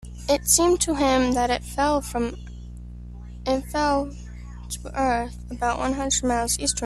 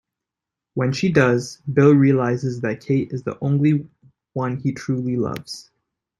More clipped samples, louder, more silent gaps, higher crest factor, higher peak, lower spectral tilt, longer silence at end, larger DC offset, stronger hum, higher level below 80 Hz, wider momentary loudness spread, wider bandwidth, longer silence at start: neither; second, -23 LUFS vs -20 LUFS; neither; about the same, 20 dB vs 18 dB; about the same, -4 dBFS vs -2 dBFS; second, -3 dB/octave vs -7.5 dB/octave; second, 0 s vs 0.6 s; neither; first, 60 Hz at -35 dBFS vs none; first, -38 dBFS vs -58 dBFS; first, 21 LU vs 13 LU; first, 13.5 kHz vs 11.5 kHz; second, 0 s vs 0.75 s